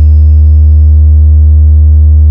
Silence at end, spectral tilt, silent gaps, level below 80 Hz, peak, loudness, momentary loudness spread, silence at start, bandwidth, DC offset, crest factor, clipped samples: 0 s; -13 dB/octave; none; -4 dBFS; 0 dBFS; -5 LUFS; 0 LU; 0 s; 0.7 kHz; under 0.1%; 2 dB; 8%